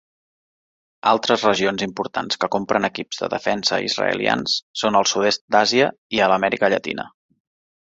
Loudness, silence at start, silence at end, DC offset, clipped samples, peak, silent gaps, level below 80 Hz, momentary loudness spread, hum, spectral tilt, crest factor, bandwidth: -20 LUFS; 1.05 s; 0.75 s; under 0.1%; under 0.1%; -2 dBFS; 4.62-4.74 s, 5.41-5.48 s, 5.98-6.10 s; -60 dBFS; 8 LU; none; -3 dB/octave; 20 dB; 8 kHz